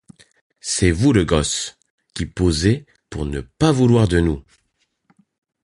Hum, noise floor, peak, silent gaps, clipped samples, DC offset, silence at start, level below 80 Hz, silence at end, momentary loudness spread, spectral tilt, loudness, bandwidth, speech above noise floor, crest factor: none; -69 dBFS; -2 dBFS; 1.90-1.98 s; under 0.1%; under 0.1%; 0.65 s; -32 dBFS; 1.25 s; 15 LU; -5.5 dB/octave; -19 LUFS; 11.5 kHz; 51 dB; 18 dB